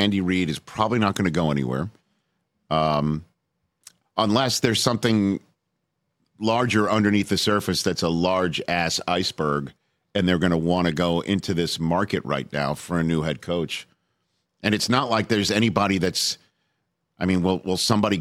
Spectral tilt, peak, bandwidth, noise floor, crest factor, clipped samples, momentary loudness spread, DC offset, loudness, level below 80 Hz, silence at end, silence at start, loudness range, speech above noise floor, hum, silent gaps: -5 dB/octave; -2 dBFS; 15.5 kHz; -77 dBFS; 20 dB; under 0.1%; 7 LU; under 0.1%; -23 LUFS; -52 dBFS; 0 s; 0 s; 3 LU; 55 dB; none; none